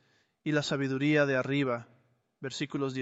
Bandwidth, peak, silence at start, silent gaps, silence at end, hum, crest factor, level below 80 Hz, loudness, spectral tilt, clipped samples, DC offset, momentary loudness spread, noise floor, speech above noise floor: 8.2 kHz; -14 dBFS; 0.45 s; none; 0 s; none; 16 dB; -72 dBFS; -30 LUFS; -6 dB/octave; under 0.1%; under 0.1%; 13 LU; -68 dBFS; 39 dB